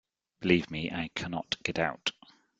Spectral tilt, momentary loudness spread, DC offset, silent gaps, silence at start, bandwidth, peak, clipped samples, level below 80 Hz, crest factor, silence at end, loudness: -5 dB/octave; 8 LU; under 0.1%; none; 0.4 s; 9 kHz; -8 dBFS; under 0.1%; -60 dBFS; 26 dB; 0.5 s; -31 LUFS